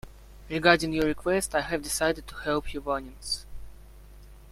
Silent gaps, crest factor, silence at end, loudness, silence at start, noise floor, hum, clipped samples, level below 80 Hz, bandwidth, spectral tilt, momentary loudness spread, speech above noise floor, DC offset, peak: none; 24 dB; 0 s; -27 LUFS; 0.05 s; -48 dBFS; 50 Hz at -45 dBFS; under 0.1%; -46 dBFS; 16 kHz; -3.5 dB/octave; 11 LU; 21 dB; under 0.1%; -4 dBFS